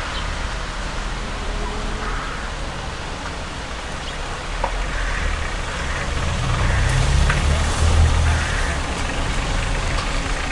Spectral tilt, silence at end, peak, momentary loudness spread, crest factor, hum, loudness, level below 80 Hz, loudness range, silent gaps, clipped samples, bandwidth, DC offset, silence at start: -4.5 dB/octave; 0 s; -4 dBFS; 10 LU; 16 dB; none; -23 LUFS; -24 dBFS; 8 LU; none; under 0.1%; 11.5 kHz; 0.6%; 0 s